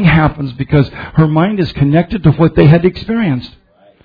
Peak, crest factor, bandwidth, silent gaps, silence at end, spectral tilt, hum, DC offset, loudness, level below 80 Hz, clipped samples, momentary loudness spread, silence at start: 0 dBFS; 12 dB; 5 kHz; none; 0.55 s; -10.5 dB/octave; none; under 0.1%; -12 LUFS; -32 dBFS; 0.3%; 8 LU; 0 s